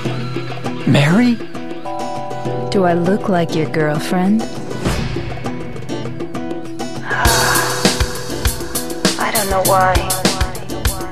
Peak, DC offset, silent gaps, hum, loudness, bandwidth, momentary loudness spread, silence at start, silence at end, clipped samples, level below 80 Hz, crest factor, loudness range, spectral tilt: 0 dBFS; 5%; none; none; -17 LUFS; 14 kHz; 13 LU; 0 s; 0 s; under 0.1%; -30 dBFS; 18 dB; 5 LU; -4.5 dB/octave